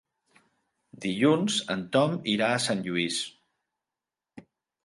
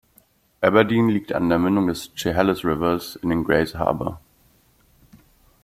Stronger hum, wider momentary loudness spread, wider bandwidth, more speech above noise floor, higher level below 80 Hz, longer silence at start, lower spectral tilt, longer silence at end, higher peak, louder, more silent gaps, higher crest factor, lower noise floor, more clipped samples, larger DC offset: neither; about the same, 9 LU vs 7 LU; second, 11.5 kHz vs 16 kHz; first, 63 dB vs 39 dB; second, -70 dBFS vs -48 dBFS; first, 1 s vs 0.6 s; second, -4.5 dB/octave vs -6.5 dB/octave; second, 0.45 s vs 1.45 s; second, -10 dBFS vs -2 dBFS; second, -27 LUFS vs -21 LUFS; neither; about the same, 20 dB vs 20 dB; first, -90 dBFS vs -59 dBFS; neither; neither